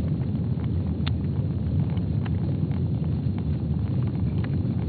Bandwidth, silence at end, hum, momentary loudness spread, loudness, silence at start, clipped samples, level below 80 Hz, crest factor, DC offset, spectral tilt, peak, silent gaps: 4.7 kHz; 0 s; none; 1 LU; -26 LUFS; 0 s; under 0.1%; -36 dBFS; 14 dB; under 0.1%; -9 dB/octave; -12 dBFS; none